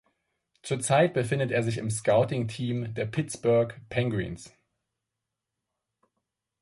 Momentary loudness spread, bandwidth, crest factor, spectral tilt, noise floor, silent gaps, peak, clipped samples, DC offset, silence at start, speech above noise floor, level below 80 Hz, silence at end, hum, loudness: 10 LU; 11.5 kHz; 18 dB; -5.5 dB/octave; -86 dBFS; none; -10 dBFS; under 0.1%; under 0.1%; 0.65 s; 59 dB; -58 dBFS; 2.15 s; none; -27 LUFS